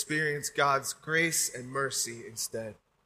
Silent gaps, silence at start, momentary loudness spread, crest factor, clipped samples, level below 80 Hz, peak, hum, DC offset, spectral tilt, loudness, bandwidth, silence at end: none; 0 s; 9 LU; 20 dB; under 0.1%; -70 dBFS; -12 dBFS; none; under 0.1%; -2.5 dB/octave; -30 LUFS; 15.5 kHz; 0.35 s